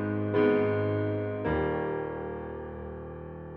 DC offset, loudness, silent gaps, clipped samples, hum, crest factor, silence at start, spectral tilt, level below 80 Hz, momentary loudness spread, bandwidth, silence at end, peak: under 0.1%; -30 LUFS; none; under 0.1%; none; 16 dB; 0 s; -7 dB/octave; -48 dBFS; 15 LU; 4.6 kHz; 0 s; -14 dBFS